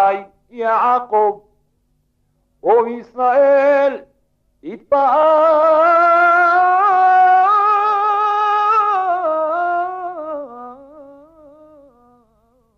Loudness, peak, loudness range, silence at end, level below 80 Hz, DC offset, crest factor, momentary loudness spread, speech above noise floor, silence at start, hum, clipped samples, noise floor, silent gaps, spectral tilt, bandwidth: -14 LUFS; -4 dBFS; 9 LU; 1.75 s; -62 dBFS; under 0.1%; 12 dB; 15 LU; 50 dB; 0 s; none; under 0.1%; -64 dBFS; none; -5 dB/octave; 6.8 kHz